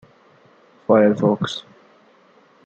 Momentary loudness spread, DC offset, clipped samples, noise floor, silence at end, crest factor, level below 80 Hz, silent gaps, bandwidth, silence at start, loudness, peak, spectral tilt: 17 LU; under 0.1%; under 0.1%; -54 dBFS; 1.05 s; 18 dB; -66 dBFS; none; 8.2 kHz; 0.9 s; -18 LUFS; -2 dBFS; -7 dB/octave